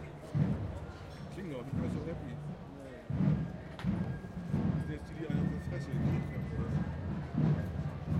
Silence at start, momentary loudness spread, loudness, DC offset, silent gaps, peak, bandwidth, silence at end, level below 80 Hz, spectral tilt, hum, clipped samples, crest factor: 0 s; 12 LU; -37 LUFS; under 0.1%; none; -18 dBFS; 10 kHz; 0 s; -48 dBFS; -9 dB/octave; none; under 0.1%; 18 dB